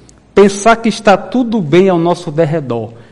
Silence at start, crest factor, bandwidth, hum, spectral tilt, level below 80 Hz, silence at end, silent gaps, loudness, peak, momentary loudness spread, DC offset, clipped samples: 0.35 s; 12 dB; 11.5 kHz; none; -6 dB/octave; -44 dBFS; 0.15 s; none; -12 LUFS; 0 dBFS; 7 LU; under 0.1%; 0.2%